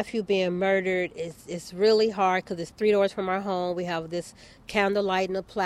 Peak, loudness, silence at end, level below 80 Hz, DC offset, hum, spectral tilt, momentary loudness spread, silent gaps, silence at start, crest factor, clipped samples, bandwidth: -10 dBFS; -26 LUFS; 0 s; -60 dBFS; under 0.1%; none; -5.5 dB/octave; 13 LU; none; 0 s; 16 dB; under 0.1%; 13 kHz